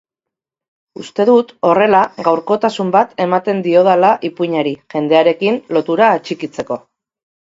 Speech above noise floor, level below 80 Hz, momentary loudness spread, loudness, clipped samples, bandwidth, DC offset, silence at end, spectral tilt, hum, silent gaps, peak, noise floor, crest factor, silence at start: 70 dB; -62 dBFS; 12 LU; -14 LUFS; under 0.1%; 7.8 kHz; under 0.1%; 0.8 s; -6.5 dB/octave; none; none; 0 dBFS; -84 dBFS; 14 dB; 1 s